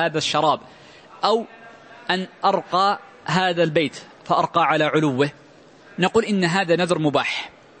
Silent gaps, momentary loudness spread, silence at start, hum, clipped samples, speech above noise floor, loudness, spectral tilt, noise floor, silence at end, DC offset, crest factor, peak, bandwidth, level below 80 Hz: none; 9 LU; 0 s; none; under 0.1%; 28 dB; -21 LUFS; -5 dB/octave; -48 dBFS; 0.3 s; under 0.1%; 18 dB; -4 dBFS; 8.8 kHz; -62 dBFS